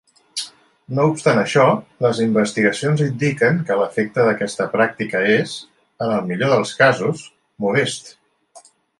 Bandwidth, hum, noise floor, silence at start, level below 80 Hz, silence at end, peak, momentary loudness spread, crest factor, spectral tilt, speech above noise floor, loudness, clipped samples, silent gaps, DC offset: 11.5 kHz; none; -49 dBFS; 0.35 s; -62 dBFS; 0.4 s; -2 dBFS; 13 LU; 18 dB; -5.5 dB/octave; 31 dB; -18 LUFS; under 0.1%; none; under 0.1%